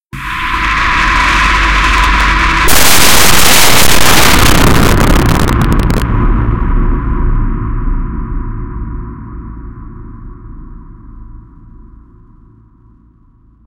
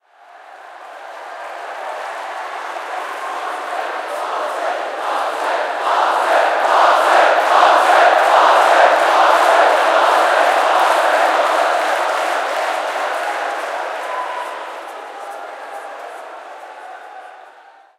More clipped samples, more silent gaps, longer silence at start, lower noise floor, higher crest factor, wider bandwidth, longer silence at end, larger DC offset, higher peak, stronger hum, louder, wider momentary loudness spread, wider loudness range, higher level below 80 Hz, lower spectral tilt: first, 1% vs under 0.1%; first, 0.06-0.10 s vs none; second, 0 s vs 0.35 s; about the same, -45 dBFS vs -45 dBFS; second, 10 dB vs 16 dB; first, over 20 kHz vs 16 kHz; second, 0 s vs 0.5 s; neither; about the same, 0 dBFS vs 0 dBFS; neither; first, -9 LUFS vs -15 LUFS; about the same, 20 LU vs 21 LU; first, 19 LU vs 16 LU; first, -16 dBFS vs -82 dBFS; first, -3 dB/octave vs 1.5 dB/octave